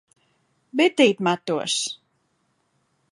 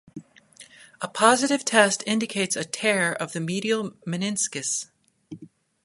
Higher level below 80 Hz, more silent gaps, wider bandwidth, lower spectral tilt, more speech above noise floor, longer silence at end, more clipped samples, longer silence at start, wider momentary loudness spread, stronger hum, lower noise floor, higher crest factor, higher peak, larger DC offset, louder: about the same, -76 dBFS vs -72 dBFS; neither; about the same, 11 kHz vs 11.5 kHz; about the same, -3.5 dB/octave vs -3 dB/octave; first, 49 dB vs 28 dB; first, 1.15 s vs 0.4 s; neither; first, 0.75 s vs 0.15 s; second, 13 LU vs 16 LU; neither; first, -70 dBFS vs -51 dBFS; about the same, 22 dB vs 24 dB; about the same, -2 dBFS vs 0 dBFS; neither; about the same, -21 LUFS vs -23 LUFS